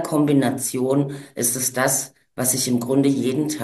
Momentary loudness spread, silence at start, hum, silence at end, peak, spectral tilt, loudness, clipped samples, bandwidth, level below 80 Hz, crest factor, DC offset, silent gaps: 4 LU; 0 s; none; 0 s; -4 dBFS; -4.5 dB/octave; -20 LUFS; under 0.1%; 13 kHz; -64 dBFS; 16 dB; under 0.1%; none